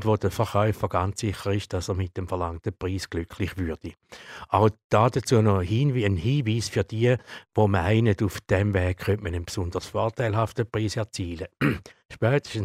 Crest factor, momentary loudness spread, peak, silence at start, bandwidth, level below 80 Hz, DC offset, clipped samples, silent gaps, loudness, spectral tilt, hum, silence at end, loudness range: 20 dB; 10 LU; -6 dBFS; 0 s; 15 kHz; -46 dBFS; under 0.1%; under 0.1%; 4.84-4.90 s; -26 LUFS; -6.5 dB/octave; none; 0 s; 5 LU